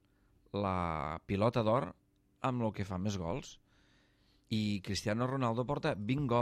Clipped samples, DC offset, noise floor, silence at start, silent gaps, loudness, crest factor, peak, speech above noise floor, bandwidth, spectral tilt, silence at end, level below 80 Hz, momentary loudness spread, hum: under 0.1%; under 0.1%; -70 dBFS; 0.55 s; none; -35 LUFS; 18 dB; -16 dBFS; 36 dB; 14 kHz; -6.5 dB/octave; 0 s; -60 dBFS; 7 LU; none